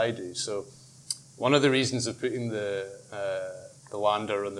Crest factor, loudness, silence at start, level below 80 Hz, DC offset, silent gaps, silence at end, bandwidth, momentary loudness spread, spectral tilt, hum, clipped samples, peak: 22 dB; -29 LUFS; 0 s; -72 dBFS; under 0.1%; none; 0 s; 13 kHz; 16 LU; -4 dB/octave; none; under 0.1%; -8 dBFS